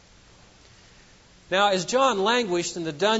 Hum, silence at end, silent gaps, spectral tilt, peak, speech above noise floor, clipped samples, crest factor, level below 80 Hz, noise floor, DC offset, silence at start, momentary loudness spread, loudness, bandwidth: none; 0 s; none; -3 dB/octave; -8 dBFS; 30 dB; under 0.1%; 18 dB; -60 dBFS; -53 dBFS; under 0.1%; 1.5 s; 6 LU; -23 LUFS; 8 kHz